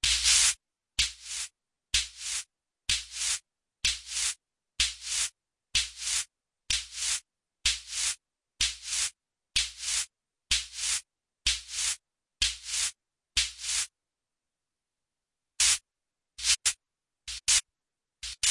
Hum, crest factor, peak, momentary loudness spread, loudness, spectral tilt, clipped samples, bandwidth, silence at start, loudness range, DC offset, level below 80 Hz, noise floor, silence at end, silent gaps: none; 22 dB; -10 dBFS; 12 LU; -28 LUFS; 3 dB/octave; under 0.1%; 11.5 kHz; 0.05 s; 3 LU; under 0.1%; -52 dBFS; -90 dBFS; 0 s; none